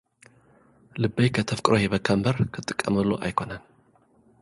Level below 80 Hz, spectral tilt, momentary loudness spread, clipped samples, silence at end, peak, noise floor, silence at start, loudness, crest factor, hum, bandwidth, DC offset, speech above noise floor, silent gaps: -52 dBFS; -6 dB/octave; 9 LU; under 0.1%; 0.8 s; -2 dBFS; -61 dBFS; 0.95 s; -25 LUFS; 24 dB; none; 11.5 kHz; under 0.1%; 37 dB; none